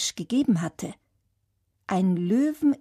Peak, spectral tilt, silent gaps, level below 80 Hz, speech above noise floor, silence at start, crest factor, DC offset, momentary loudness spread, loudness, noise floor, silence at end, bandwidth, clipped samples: -12 dBFS; -5.5 dB/octave; none; -66 dBFS; 49 dB; 0 s; 14 dB; under 0.1%; 15 LU; -25 LUFS; -73 dBFS; 0.05 s; 15 kHz; under 0.1%